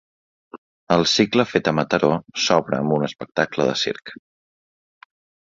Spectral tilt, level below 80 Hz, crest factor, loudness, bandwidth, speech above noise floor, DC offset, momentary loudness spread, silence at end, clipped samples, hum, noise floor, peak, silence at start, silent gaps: -4.5 dB/octave; -56 dBFS; 20 dB; -20 LUFS; 7.8 kHz; over 70 dB; under 0.1%; 8 LU; 1.35 s; under 0.1%; none; under -90 dBFS; -2 dBFS; 0.55 s; 0.58-0.87 s